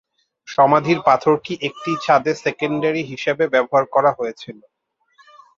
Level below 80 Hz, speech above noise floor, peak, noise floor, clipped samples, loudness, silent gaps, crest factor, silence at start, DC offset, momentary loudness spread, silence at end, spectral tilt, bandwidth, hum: -64 dBFS; 40 dB; -2 dBFS; -58 dBFS; under 0.1%; -18 LUFS; none; 18 dB; 0.5 s; under 0.1%; 11 LU; 1.05 s; -6 dB/octave; 7.6 kHz; none